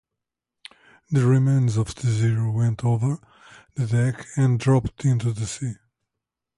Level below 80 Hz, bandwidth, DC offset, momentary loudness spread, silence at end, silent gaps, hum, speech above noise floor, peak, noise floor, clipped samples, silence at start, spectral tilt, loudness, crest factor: -50 dBFS; 11.5 kHz; under 0.1%; 11 LU; 0.85 s; none; none; 64 dB; -8 dBFS; -85 dBFS; under 0.1%; 1.1 s; -7 dB/octave; -23 LUFS; 16 dB